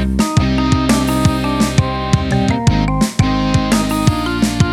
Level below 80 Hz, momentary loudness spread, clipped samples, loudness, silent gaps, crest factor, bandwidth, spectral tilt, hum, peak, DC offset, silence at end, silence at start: -24 dBFS; 3 LU; under 0.1%; -15 LUFS; none; 14 dB; 17 kHz; -5.5 dB/octave; none; 0 dBFS; under 0.1%; 0 s; 0 s